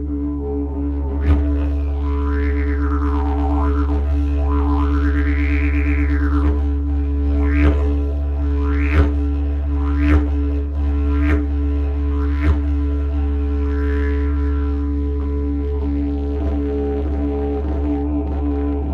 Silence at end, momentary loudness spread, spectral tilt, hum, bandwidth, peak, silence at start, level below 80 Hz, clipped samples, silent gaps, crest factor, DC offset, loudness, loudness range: 0 s; 5 LU; -10 dB/octave; none; 4.2 kHz; -2 dBFS; 0 s; -18 dBFS; under 0.1%; none; 16 dB; under 0.1%; -20 LUFS; 3 LU